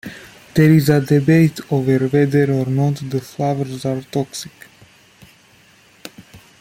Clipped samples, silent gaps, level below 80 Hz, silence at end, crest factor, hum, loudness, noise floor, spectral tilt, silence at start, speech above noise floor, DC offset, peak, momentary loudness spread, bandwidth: under 0.1%; none; -52 dBFS; 0.25 s; 16 dB; none; -17 LUFS; -50 dBFS; -7.5 dB/octave; 0.05 s; 35 dB; under 0.1%; -2 dBFS; 23 LU; 16 kHz